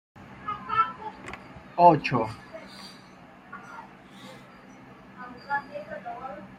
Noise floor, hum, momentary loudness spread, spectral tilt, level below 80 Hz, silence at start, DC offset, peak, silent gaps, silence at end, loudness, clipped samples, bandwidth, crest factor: -50 dBFS; none; 29 LU; -7 dB/octave; -62 dBFS; 0.15 s; under 0.1%; -4 dBFS; none; 0 s; -26 LUFS; under 0.1%; 11.5 kHz; 26 dB